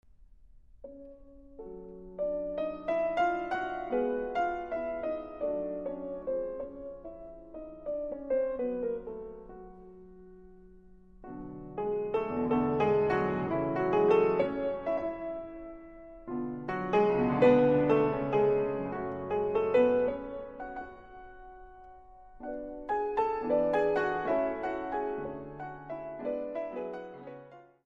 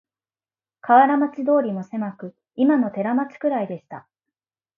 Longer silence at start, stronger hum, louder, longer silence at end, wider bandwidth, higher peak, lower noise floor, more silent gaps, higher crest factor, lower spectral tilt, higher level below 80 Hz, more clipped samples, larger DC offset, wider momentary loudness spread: about the same, 0.8 s vs 0.85 s; neither; second, -31 LUFS vs -21 LUFS; second, 0.2 s vs 0.75 s; first, 7 kHz vs 3.9 kHz; second, -10 dBFS vs -2 dBFS; second, -57 dBFS vs under -90 dBFS; neither; about the same, 20 dB vs 20 dB; about the same, -8.5 dB/octave vs -9 dB/octave; first, -56 dBFS vs -76 dBFS; neither; neither; about the same, 21 LU vs 21 LU